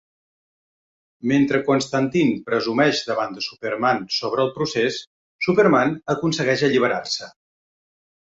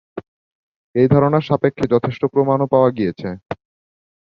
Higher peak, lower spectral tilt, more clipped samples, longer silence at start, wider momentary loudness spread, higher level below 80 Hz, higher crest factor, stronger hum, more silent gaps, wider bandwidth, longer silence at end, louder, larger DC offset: about the same, -4 dBFS vs -2 dBFS; second, -5 dB/octave vs -9.5 dB/octave; neither; first, 1.25 s vs 0.15 s; second, 9 LU vs 18 LU; second, -62 dBFS vs -50 dBFS; about the same, 18 dB vs 18 dB; neither; second, 5.07-5.39 s vs 0.28-0.94 s; first, 8 kHz vs 6.8 kHz; first, 0.95 s vs 0.75 s; second, -21 LUFS vs -17 LUFS; neither